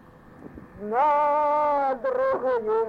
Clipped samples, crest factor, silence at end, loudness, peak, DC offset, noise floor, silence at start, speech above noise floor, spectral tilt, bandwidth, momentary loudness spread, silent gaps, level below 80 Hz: under 0.1%; 10 dB; 0 s; -23 LUFS; -14 dBFS; under 0.1%; -46 dBFS; 0.4 s; 23 dB; -7 dB/octave; 6.8 kHz; 8 LU; none; -58 dBFS